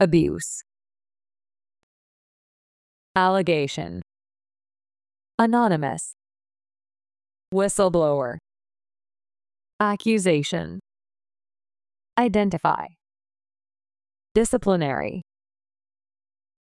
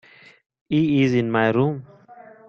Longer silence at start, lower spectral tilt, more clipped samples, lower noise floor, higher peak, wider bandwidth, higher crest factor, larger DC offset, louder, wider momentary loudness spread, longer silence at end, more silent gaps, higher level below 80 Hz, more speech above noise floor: second, 0 s vs 0.7 s; second, -5.5 dB/octave vs -8 dB/octave; neither; first, under -90 dBFS vs -46 dBFS; about the same, -6 dBFS vs -4 dBFS; first, 12 kHz vs 6.8 kHz; about the same, 20 dB vs 18 dB; neither; second, -23 LUFS vs -20 LUFS; first, 15 LU vs 6 LU; first, 1.4 s vs 0.3 s; first, 1.83-3.15 s, 5.34-5.38 s, 7.48-7.52 s, 9.73-9.79 s, 14.31-14.35 s vs none; first, -52 dBFS vs -58 dBFS; first, over 68 dB vs 27 dB